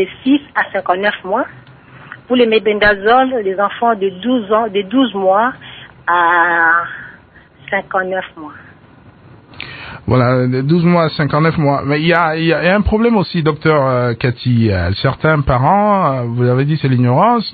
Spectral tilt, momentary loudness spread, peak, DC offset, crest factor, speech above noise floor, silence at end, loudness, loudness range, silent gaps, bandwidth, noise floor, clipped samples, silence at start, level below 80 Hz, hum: -10.5 dB/octave; 9 LU; 0 dBFS; under 0.1%; 14 dB; 30 dB; 0 s; -14 LUFS; 5 LU; none; 4.8 kHz; -43 dBFS; under 0.1%; 0 s; -36 dBFS; none